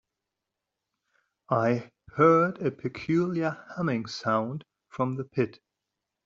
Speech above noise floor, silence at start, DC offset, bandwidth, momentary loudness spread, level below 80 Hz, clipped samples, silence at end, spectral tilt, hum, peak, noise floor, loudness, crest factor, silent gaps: 59 dB; 1.5 s; under 0.1%; 7.6 kHz; 13 LU; -68 dBFS; under 0.1%; 0.75 s; -6.5 dB/octave; none; -8 dBFS; -86 dBFS; -27 LUFS; 22 dB; none